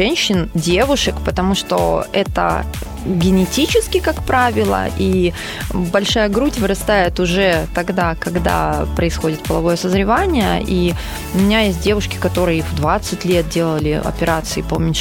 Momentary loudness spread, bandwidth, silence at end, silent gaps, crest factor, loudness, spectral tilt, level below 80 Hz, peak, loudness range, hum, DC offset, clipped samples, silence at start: 5 LU; 17 kHz; 0 s; none; 14 dB; -17 LUFS; -5 dB/octave; -28 dBFS; -2 dBFS; 1 LU; none; under 0.1%; under 0.1%; 0 s